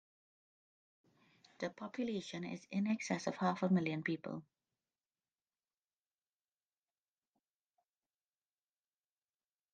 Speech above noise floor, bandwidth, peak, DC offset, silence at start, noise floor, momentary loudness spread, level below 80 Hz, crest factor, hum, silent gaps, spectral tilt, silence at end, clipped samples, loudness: over 51 dB; 9 kHz; -22 dBFS; under 0.1%; 1.6 s; under -90 dBFS; 11 LU; -86 dBFS; 22 dB; none; none; -6 dB/octave; 5.3 s; under 0.1%; -39 LUFS